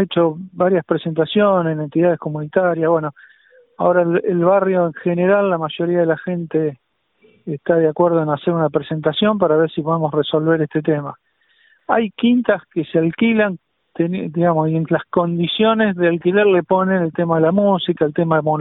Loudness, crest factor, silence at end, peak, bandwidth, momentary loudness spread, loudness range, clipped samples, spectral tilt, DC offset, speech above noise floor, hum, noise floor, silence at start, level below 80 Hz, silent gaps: -17 LUFS; 16 dB; 0 s; -2 dBFS; 4.1 kHz; 6 LU; 3 LU; under 0.1%; -12 dB/octave; under 0.1%; 40 dB; none; -57 dBFS; 0 s; -58 dBFS; none